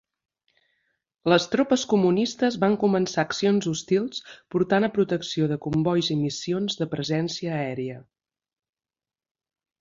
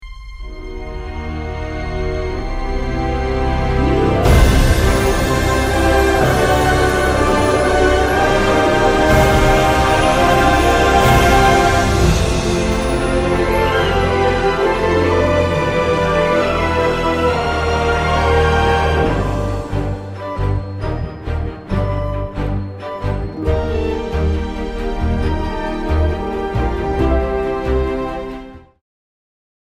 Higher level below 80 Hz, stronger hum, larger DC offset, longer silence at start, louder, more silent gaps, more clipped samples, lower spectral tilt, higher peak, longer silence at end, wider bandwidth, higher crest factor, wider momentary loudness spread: second, -62 dBFS vs -22 dBFS; neither; neither; first, 1.25 s vs 0 s; second, -24 LUFS vs -16 LUFS; neither; neither; about the same, -5.5 dB/octave vs -5.5 dB/octave; second, -6 dBFS vs 0 dBFS; first, 1.8 s vs 1.2 s; second, 7.6 kHz vs 16 kHz; about the same, 18 dB vs 14 dB; second, 9 LU vs 12 LU